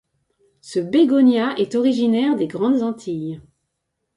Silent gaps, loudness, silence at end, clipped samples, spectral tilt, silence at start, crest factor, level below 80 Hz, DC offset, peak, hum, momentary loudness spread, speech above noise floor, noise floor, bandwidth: none; -19 LUFS; 0.75 s; under 0.1%; -6.5 dB/octave; 0.65 s; 14 dB; -64 dBFS; under 0.1%; -6 dBFS; none; 13 LU; 58 dB; -76 dBFS; 11 kHz